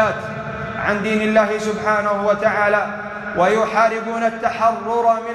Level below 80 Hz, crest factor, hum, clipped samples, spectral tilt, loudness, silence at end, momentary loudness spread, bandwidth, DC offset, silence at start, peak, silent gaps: -52 dBFS; 14 dB; none; under 0.1%; -5.5 dB/octave; -18 LUFS; 0 s; 9 LU; 12 kHz; under 0.1%; 0 s; -4 dBFS; none